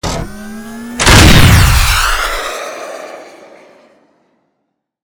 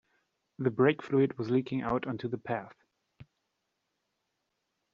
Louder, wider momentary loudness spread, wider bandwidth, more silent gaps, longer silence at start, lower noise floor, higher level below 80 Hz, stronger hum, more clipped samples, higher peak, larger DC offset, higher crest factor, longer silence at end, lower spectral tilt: first, -8 LUFS vs -31 LUFS; first, 23 LU vs 10 LU; first, over 20 kHz vs 7 kHz; neither; second, 0.05 s vs 0.6 s; second, -69 dBFS vs -82 dBFS; first, -18 dBFS vs -68 dBFS; neither; first, 2% vs under 0.1%; first, 0 dBFS vs -12 dBFS; neither; second, 12 dB vs 22 dB; about the same, 1.75 s vs 1.7 s; second, -4 dB/octave vs -6.5 dB/octave